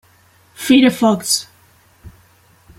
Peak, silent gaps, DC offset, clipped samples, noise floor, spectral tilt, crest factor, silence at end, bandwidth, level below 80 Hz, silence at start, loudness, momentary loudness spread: 0 dBFS; none; under 0.1%; under 0.1%; -52 dBFS; -3.5 dB/octave; 18 dB; 0.7 s; 16.5 kHz; -52 dBFS; 0.6 s; -14 LUFS; 7 LU